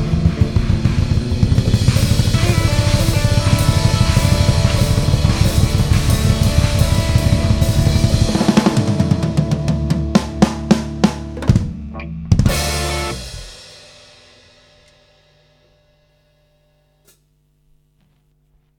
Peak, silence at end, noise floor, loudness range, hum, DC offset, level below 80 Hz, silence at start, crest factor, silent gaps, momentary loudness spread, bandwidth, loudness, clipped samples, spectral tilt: 0 dBFS; 5.05 s; -59 dBFS; 7 LU; none; under 0.1%; -24 dBFS; 0 s; 16 dB; none; 5 LU; 18.5 kHz; -16 LUFS; under 0.1%; -6 dB/octave